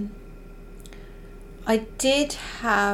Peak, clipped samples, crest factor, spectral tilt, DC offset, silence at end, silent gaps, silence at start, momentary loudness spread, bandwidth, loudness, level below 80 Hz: -6 dBFS; under 0.1%; 20 dB; -3 dB/octave; under 0.1%; 0 s; none; 0 s; 24 LU; 17 kHz; -24 LUFS; -42 dBFS